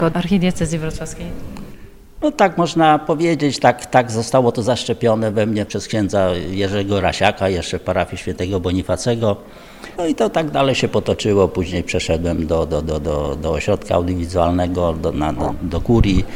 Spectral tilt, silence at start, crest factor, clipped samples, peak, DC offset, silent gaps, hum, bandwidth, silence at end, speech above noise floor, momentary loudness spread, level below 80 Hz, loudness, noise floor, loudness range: -6 dB/octave; 0 s; 18 dB; under 0.1%; 0 dBFS; under 0.1%; none; none; 16.5 kHz; 0 s; 20 dB; 8 LU; -32 dBFS; -18 LUFS; -37 dBFS; 3 LU